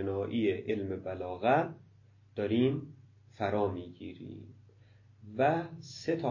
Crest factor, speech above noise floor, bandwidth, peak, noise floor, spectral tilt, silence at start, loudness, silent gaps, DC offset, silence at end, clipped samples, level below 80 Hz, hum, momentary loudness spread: 20 dB; 28 dB; 7.4 kHz; -14 dBFS; -60 dBFS; -7.5 dB/octave; 0 s; -33 LUFS; none; under 0.1%; 0 s; under 0.1%; -60 dBFS; none; 17 LU